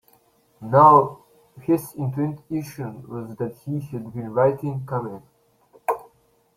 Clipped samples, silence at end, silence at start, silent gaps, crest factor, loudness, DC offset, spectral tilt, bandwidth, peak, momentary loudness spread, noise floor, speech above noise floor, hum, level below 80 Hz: under 0.1%; 0.55 s; 0.6 s; none; 22 dB; -22 LUFS; under 0.1%; -8.5 dB/octave; 16.5 kHz; -2 dBFS; 20 LU; -60 dBFS; 39 dB; none; -62 dBFS